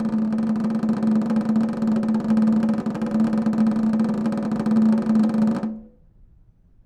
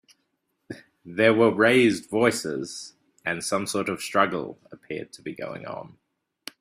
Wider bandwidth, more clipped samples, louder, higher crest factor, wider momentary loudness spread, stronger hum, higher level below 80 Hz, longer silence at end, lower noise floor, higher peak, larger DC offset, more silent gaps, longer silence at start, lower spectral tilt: second, 8.8 kHz vs 15.5 kHz; neither; about the same, -21 LUFS vs -23 LUFS; second, 10 dB vs 22 dB; second, 5 LU vs 24 LU; neither; first, -52 dBFS vs -66 dBFS; first, 1 s vs 0.75 s; second, -53 dBFS vs -75 dBFS; second, -10 dBFS vs -4 dBFS; neither; neither; second, 0 s vs 0.7 s; first, -8.5 dB/octave vs -4.5 dB/octave